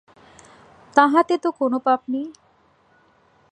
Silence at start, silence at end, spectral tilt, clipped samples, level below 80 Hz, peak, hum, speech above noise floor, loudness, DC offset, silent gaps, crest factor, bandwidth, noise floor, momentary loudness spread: 0.95 s; 1.2 s; -4.5 dB/octave; under 0.1%; -70 dBFS; 0 dBFS; none; 40 dB; -20 LUFS; under 0.1%; none; 22 dB; 9.8 kHz; -59 dBFS; 12 LU